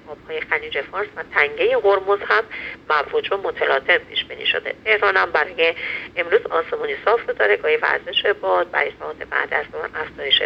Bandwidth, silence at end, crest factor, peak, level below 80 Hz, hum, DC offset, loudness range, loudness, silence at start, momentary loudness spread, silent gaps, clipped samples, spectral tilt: 6.4 kHz; 0 s; 20 dB; 0 dBFS; -56 dBFS; none; under 0.1%; 1 LU; -20 LUFS; 0.05 s; 10 LU; none; under 0.1%; -4 dB/octave